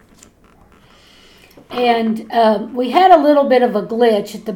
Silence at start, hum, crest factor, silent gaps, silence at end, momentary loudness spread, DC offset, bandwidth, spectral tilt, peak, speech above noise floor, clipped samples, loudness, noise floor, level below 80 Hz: 1.7 s; none; 16 dB; none; 0 s; 9 LU; under 0.1%; 17 kHz; -5.5 dB/octave; 0 dBFS; 35 dB; under 0.1%; -14 LUFS; -48 dBFS; -56 dBFS